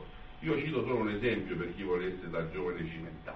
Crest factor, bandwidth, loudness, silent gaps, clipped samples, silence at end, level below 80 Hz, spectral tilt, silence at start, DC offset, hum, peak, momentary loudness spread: 16 dB; 6.2 kHz; -35 LUFS; none; under 0.1%; 0 s; -52 dBFS; -8.5 dB/octave; 0 s; under 0.1%; none; -18 dBFS; 9 LU